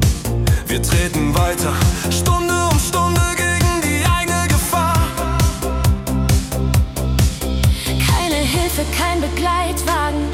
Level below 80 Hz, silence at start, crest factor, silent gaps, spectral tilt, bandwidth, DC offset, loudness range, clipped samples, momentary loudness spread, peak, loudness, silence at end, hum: -24 dBFS; 0 s; 12 dB; none; -4.5 dB/octave; 17 kHz; under 0.1%; 2 LU; under 0.1%; 3 LU; -4 dBFS; -17 LUFS; 0 s; none